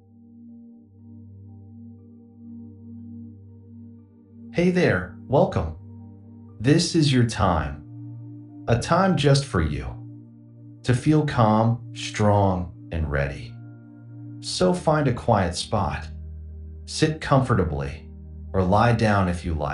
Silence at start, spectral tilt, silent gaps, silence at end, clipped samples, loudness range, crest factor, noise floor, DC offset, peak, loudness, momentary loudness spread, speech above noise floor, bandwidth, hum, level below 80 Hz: 0.35 s; -6 dB/octave; none; 0 s; under 0.1%; 9 LU; 20 dB; -48 dBFS; under 0.1%; -4 dBFS; -22 LUFS; 23 LU; 26 dB; 11.5 kHz; none; -42 dBFS